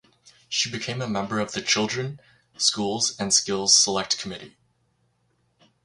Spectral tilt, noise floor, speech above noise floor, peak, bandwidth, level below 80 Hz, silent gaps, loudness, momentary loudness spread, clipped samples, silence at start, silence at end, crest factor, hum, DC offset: -2 dB/octave; -69 dBFS; 44 dB; -4 dBFS; 11.5 kHz; -62 dBFS; none; -22 LUFS; 12 LU; under 0.1%; 0.25 s; 1.35 s; 22 dB; none; under 0.1%